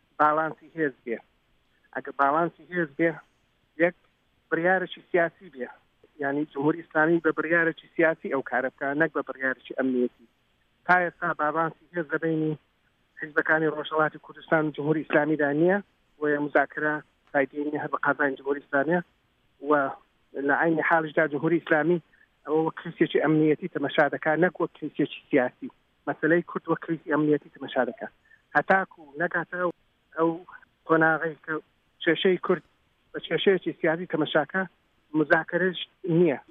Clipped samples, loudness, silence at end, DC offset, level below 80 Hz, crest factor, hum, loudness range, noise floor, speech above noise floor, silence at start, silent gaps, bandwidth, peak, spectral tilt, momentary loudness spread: under 0.1%; -26 LUFS; 0.1 s; under 0.1%; -72 dBFS; 20 dB; none; 3 LU; -68 dBFS; 43 dB; 0.2 s; none; 5 kHz; -8 dBFS; -8.5 dB/octave; 12 LU